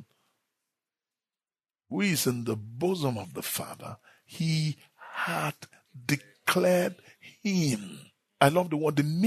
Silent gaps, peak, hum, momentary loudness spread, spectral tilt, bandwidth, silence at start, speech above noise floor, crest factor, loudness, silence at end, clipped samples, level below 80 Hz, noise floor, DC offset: none; -4 dBFS; none; 19 LU; -5 dB/octave; 13.5 kHz; 0 s; over 62 dB; 26 dB; -29 LUFS; 0 s; under 0.1%; -70 dBFS; under -90 dBFS; under 0.1%